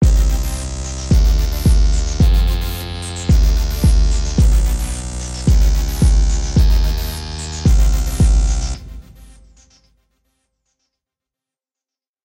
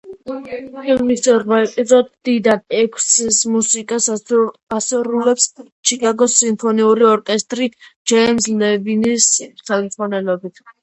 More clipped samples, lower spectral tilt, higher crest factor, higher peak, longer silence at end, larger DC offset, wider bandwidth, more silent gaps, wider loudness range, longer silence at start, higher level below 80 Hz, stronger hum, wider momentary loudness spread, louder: neither; first, -5.5 dB/octave vs -2.5 dB/octave; about the same, 12 dB vs 16 dB; about the same, -2 dBFS vs 0 dBFS; first, 3 s vs 0.1 s; neither; first, 16.5 kHz vs 8.8 kHz; second, none vs 4.63-4.67 s, 5.72-5.83 s, 7.96-8.05 s; first, 5 LU vs 2 LU; about the same, 0 s vs 0.05 s; first, -16 dBFS vs -58 dBFS; neither; about the same, 10 LU vs 9 LU; about the same, -17 LUFS vs -15 LUFS